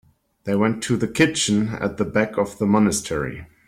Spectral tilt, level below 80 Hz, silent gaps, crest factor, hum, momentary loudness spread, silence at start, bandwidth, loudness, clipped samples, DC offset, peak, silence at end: -4.5 dB/octave; -50 dBFS; none; 16 dB; none; 8 LU; 0.45 s; 15 kHz; -21 LUFS; under 0.1%; under 0.1%; -4 dBFS; 0.2 s